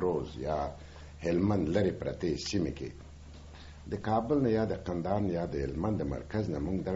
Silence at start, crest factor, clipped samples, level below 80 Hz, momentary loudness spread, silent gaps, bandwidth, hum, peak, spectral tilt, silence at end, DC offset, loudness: 0 s; 18 dB; under 0.1%; -48 dBFS; 20 LU; none; 8 kHz; none; -14 dBFS; -7 dB/octave; 0 s; under 0.1%; -32 LUFS